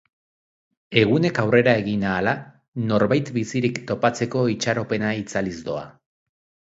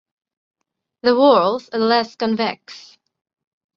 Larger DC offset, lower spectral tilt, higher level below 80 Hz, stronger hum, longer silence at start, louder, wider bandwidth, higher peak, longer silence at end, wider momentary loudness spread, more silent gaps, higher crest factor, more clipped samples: neither; about the same, -6 dB/octave vs -5.5 dB/octave; first, -54 dBFS vs -66 dBFS; neither; second, 0.9 s vs 1.05 s; second, -22 LUFS vs -17 LUFS; first, 8 kHz vs 7.2 kHz; about the same, 0 dBFS vs -2 dBFS; about the same, 0.85 s vs 0.95 s; about the same, 11 LU vs 12 LU; first, 2.68-2.72 s vs none; about the same, 22 dB vs 18 dB; neither